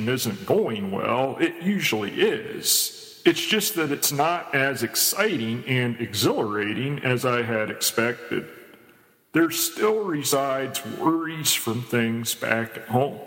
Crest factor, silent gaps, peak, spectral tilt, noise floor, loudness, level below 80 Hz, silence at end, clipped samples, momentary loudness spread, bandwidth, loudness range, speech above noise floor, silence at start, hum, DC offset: 20 dB; none; -6 dBFS; -3.5 dB/octave; -56 dBFS; -23 LUFS; -70 dBFS; 0 s; under 0.1%; 5 LU; 17 kHz; 3 LU; 32 dB; 0 s; none; under 0.1%